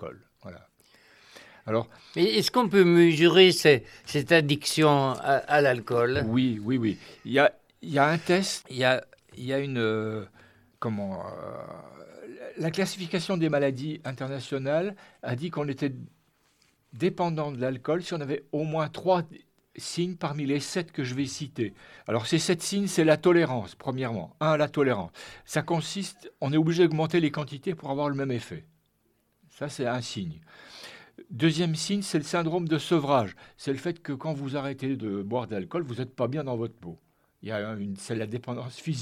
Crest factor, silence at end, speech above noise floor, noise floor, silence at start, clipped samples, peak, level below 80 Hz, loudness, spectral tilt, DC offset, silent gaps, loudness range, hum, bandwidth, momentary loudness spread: 22 dB; 0 s; 44 dB; -71 dBFS; 0 s; under 0.1%; -6 dBFS; -66 dBFS; -27 LUFS; -5.5 dB/octave; under 0.1%; none; 11 LU; none; 15 kHz; 17 LU